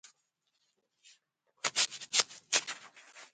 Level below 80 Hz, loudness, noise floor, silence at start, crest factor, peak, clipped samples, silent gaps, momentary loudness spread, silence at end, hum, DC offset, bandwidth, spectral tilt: -82 dBFS; -32 LUFS; -80 dBFS; 1.65 s; 30 dB; -8 dBFS; under 0.1%; none; 19 LU; 0.1 s; none; under 0.1%; 9.4 kHz; 2 dB/octave